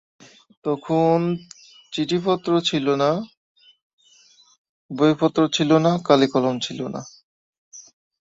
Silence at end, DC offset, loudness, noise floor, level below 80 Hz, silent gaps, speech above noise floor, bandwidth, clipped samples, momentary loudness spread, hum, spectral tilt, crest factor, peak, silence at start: 0.5 s; under 0.1%; -21 LUFS; -55 dBFS; -64 dBFS; 3.37-3.55 s, 3.82-3.98 s, 4.58-4.89 s, 7.24-7.71 s; 35 dB; 7.8 kHz; under 0.1%; 14 LU; none; -6 dB/octave; 20 dB; -2 dBFS; 0.65 s